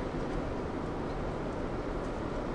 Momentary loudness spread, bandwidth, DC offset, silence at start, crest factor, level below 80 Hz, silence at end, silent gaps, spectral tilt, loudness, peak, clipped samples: 1 LU; 11 kHz; under 0.1%; 0 s; 12 dB; -42 dBFS; 0 s; none; -7.5 dB/octave; -36 LUFS; -24 dBFS; under 0.1%